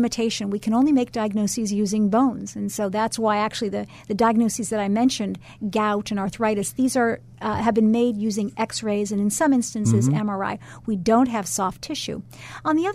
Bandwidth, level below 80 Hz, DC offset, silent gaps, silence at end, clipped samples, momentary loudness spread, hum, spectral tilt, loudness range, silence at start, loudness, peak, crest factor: 15 kHz; -54 dBFS; under 0.1%; none; 0 s; under 0.1%; 10 LU; none; -5 dB/octave; 1 LU; 0 s; -23 LUFS; -8 dBFS; 14 dB